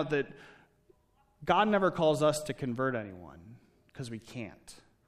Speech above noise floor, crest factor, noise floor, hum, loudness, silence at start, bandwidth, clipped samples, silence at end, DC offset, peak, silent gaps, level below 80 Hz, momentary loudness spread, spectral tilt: 38 dB; 22 dB; -69 dBFS; none; -31 LUFS; 0 s; 15 kHz; under 0.1%; 0.3 s; under 0.1%; -12 dBFS; none; -64 dBFS; 19 LU; -5.5 dB/octave